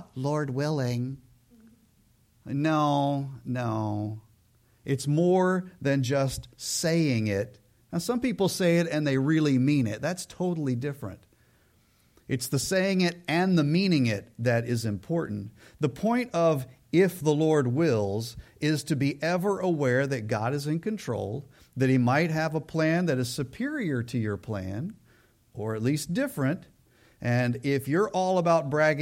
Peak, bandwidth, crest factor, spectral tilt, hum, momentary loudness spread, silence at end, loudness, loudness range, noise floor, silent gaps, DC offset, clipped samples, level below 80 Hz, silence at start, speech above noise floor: -10 dBFS; 16.5 kHz; 16 dB; -6 dB/octave; none; 11 LU; 0 s; -27 LUFS; 4 LU; -64 dBFS; none; under 0.1%; under 0.1%; -60 dBFS; 0 s; 37 dB